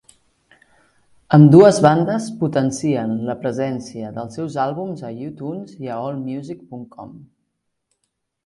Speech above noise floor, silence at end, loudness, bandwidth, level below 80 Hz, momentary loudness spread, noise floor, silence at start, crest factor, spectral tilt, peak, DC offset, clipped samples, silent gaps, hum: 57 dB; 1.25 s; -17 LUFS; 11.5 kHz; -58 dBFS; 21 LU; -74 dBFS; 1.3 s; 18 dB; -7.5 dB/octave; 0 dBFS; under 0.1%; under 0.1%; none; none